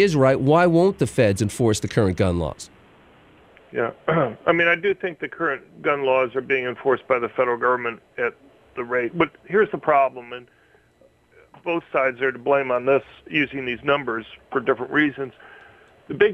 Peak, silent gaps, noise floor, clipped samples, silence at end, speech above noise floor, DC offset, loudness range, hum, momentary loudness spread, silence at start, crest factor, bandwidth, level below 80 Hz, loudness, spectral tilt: -2 dBFS; none; -57 dBFS; under 0.1%; 0 s; 36 dB; under 0.1%; 2 LU; none; 12 LU; 0 s; 20 dB; 14 kHz; -52 dBFS; -22 LUFS; -6 dB/octave